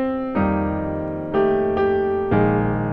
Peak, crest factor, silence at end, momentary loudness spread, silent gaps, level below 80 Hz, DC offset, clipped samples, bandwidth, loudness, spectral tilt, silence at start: -4 dBFS; 16 dB; 0 s; 6 LU; none; -40 dBFS; under 0.1%; under 0.1%; 5.2 kHz; -21 LUFS; -10.5 dB/octave; 0 s